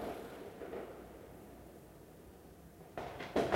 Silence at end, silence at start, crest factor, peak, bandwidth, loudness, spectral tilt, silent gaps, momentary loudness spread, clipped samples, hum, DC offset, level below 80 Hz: 0 s; 0 s; 28 dB; -16 dBFS; 16 kHz; -47 LUFS; -5.5 dB/octave; none; 15 LU; under 0.1%; none; under 0.1%; -62 dBFS